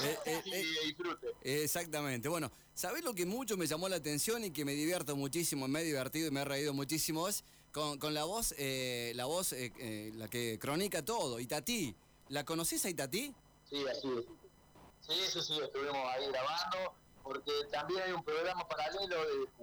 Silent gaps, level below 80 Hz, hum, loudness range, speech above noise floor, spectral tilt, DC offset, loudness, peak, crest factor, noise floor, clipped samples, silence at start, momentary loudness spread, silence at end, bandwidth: none; -66 dBFS; none; 2 LU; 24 dB; -3 dB/octave; under 0.1%; -37 LUFS; -28 dBFS; 12 dB; -62 dBFS; under 0.1%; 0 s; 7 LU; 0 s; over 20 kHz